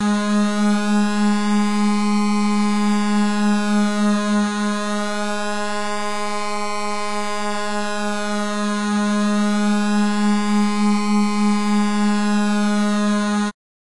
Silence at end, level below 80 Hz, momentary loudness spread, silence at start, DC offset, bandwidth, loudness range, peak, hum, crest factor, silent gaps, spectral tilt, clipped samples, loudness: 0.4 s; -66 dBFS; 6 LU; 0 s; under 0.1%; 11.5 kHz; 5 LU; -10 dBFS; none; 8 dB; none; -5 dB/octave; under 0.1%; -20 LUFS